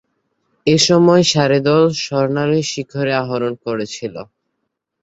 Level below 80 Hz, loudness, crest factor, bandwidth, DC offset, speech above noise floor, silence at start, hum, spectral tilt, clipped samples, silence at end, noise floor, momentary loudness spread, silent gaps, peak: -56 dBFS; -15 LUFS; 16 dB; 8.2 kHz; under 0.1%; 59 dB; 0.65 s; none; -5 dB/octave; under 0.1%; 0.8 s; -74 dBFS; 13 LU; none; 0 dBFS